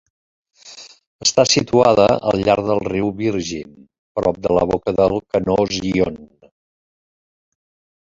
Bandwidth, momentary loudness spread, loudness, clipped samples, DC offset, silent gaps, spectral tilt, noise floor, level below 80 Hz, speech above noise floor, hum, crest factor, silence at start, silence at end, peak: 8 kHz; 13 LU; -17 LUFS; under 0.1%; under 0.1%; 1.07-1.19 s, 3.99-4.15 s; -4.5 dB/octave; -41 dBFS; -44 dBFS; 24 dB; none; 18 dB; 0.65 s; 1.85 s; 0 dBFS